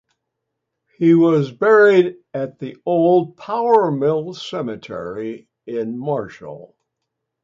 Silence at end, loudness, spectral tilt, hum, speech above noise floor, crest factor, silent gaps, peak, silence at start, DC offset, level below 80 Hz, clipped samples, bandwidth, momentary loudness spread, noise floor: 0.8 s; -18 LUFS; -7.5 dB/octave; none; 61 dB; 16 dB; none; -2 dBFS; 1 s; under 0.1%; -64 dBFS; under 0.1%; 7.4 kHz; 16 LU; -78 dBFS